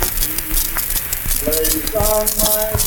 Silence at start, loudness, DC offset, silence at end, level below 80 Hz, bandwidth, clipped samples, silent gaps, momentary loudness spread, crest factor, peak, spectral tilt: 0 s; -16 LUFS; under 0.1%; 0 s; -26 dBFS; 19.5 kHz; under 0.1%; none; 4 LU; 16 dB; -2 dBFS; -2.5 dB/octave